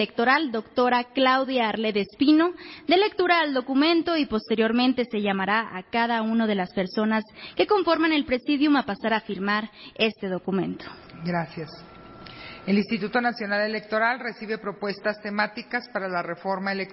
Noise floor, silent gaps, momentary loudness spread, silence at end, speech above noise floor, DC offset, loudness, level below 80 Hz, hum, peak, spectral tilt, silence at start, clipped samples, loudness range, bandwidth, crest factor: -44 dBFS; none; 11 LU; 0 s; 19 dB; under 0.1%; -24 LUFS; -60 dBFS; none; -8 dBFS; -9.5 dB/octave; 0 s; under 0.1%; 6 LU; 5.8 kHz; 18 dB